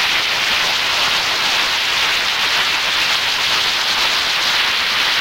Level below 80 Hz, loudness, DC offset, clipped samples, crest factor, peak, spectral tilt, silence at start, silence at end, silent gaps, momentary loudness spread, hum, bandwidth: -48 dBFS; -14 LUFS; under 0.1%; under 0.1%; 14 dB; -2 dBFS; 0.5 dB/octave; 0 s; 0 s; none; 1 LU; none; 16 kHz